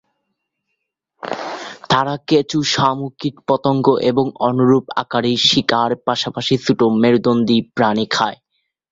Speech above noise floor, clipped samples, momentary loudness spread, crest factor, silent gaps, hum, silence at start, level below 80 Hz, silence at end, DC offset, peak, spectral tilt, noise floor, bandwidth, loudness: 59 dB; under 0.1%; 11 LU; 16 dB; none; none; 1.25 s; -56 dBFS; 0.55 s; under 0.1%; 0 dBFS; -5 dB/octave; -75 dBFS; 7.8 kHz; -17 LUFS